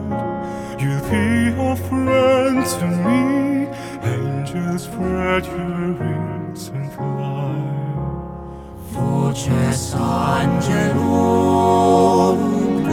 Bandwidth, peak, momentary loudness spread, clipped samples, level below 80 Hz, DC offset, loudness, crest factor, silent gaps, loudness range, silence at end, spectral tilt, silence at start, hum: 17.5 kHz; 0 dBFS; 12 LU; under 0.1%; -42 dBFS; under 0.1%; -19 LUFS; 18 dB; none; 8 LU; 0 s; -6.5 dB/octave; 0 s; none